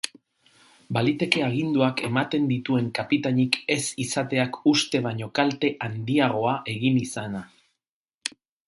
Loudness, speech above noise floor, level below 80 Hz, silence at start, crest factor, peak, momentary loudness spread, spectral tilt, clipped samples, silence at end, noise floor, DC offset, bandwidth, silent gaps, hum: -25 LUFS; 62 dB; -64 dBFS; 0.05 s; 24 dB; -2 dBFS; 10 LU; -5 dB/octave; under 0.1%; 0.4 s; -86 dBFS; under 0.1%; 11.5 kHz; 7.89-8.06 s, 8.14-8.21 s; none